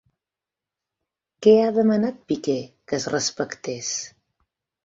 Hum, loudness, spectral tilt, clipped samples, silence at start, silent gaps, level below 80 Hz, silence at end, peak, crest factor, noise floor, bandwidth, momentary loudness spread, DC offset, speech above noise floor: none; -22 LUFS; -4.5 dB/octave; under 0.1%; 1.4 s; none; -64 dBFS; 0.8 s; -4 dBFS; 20 dB; -88 dBFS; 7.8 kHz; 13 LU; under 0.1%; 67 dB